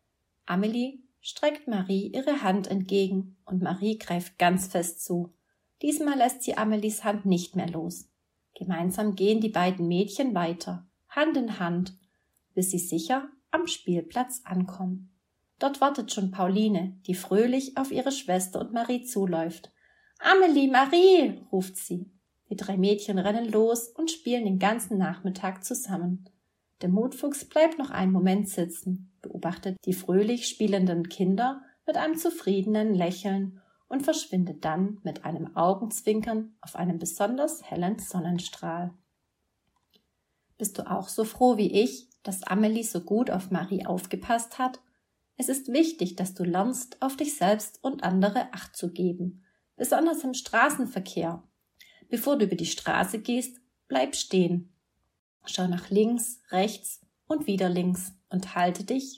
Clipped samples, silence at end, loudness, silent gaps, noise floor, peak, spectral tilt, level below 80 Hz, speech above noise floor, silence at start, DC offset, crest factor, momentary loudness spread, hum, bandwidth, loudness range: under 0.1%; 0 s; -27 LUFS; 55.19-55.40 s; -78 dBFS; -6 dBFS; -5 dB/octave; -68 dBFS; 51 dB; 0.45 s; under 0.1%; 22 dB; 10 LU; none; 16 kHz; 5 LU